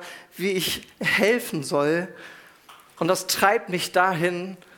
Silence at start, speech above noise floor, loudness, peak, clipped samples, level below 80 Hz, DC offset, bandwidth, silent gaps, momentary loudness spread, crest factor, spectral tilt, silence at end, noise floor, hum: 0 s; 27 dB; -23 LUFS; -2 dBFS; under 0.1%; -64 dBFS; under 0.1%; 18 kHz; none; 13 LU; 22 dB; -3.5 dB/octave; 0.2 s; -51 dBFS; none